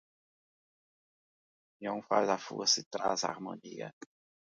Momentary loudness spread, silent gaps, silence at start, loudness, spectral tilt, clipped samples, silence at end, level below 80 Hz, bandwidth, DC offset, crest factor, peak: 16 LU; 2.86-2.91 s; 1.8 s; -32 LUFS; -2 dB/octave; under 0.1%; 0.55 s; -82 dBFS; 10 kHz; under 0.1%; 24 dB; -12 dBFS